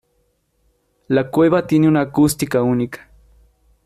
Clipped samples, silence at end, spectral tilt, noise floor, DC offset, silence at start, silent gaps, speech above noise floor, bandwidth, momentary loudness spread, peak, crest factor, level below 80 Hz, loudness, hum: under 0.1%; 0.9 s; -6.5 dB/octave; -65 dBFS; under 0.1%; 1.1 s; none; 49 dB; 15 kHz; 7 LU; -4 dBFS; 16 dB; -50 dBFS; -17 LUFS; none